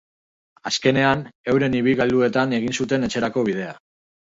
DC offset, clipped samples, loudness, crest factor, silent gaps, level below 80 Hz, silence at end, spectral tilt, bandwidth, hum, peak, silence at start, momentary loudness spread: under 0.1%; under 0.1%; -21 LUFS; 18 dB; 1.35-1.44 s; -54 dBFS; 0.6 s; -5 dB/octave; 7.8 kHz; none; -4 dBFS; 0.65 s; 7 LU